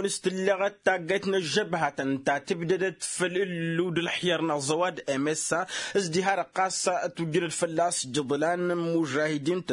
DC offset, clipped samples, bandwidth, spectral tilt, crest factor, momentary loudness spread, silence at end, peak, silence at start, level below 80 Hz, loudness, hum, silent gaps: under 0.1%; under 0.1%; 11 kHz; -4 dB/octave; 18 dB; 3 LU; 0 s; -10 dBFS; 0 s; -72 dBFS; -27 LUFS; none; none